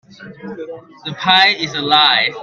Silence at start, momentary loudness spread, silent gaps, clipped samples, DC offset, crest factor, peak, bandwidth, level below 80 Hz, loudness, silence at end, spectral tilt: 0.2 s; 21 LU; none; under 0.1%; under 0.1%; 16 dB; 0 dBFS; 8.2 kHz; -62 dBFS; -12 LUFS; 0 s; -3 dB/octave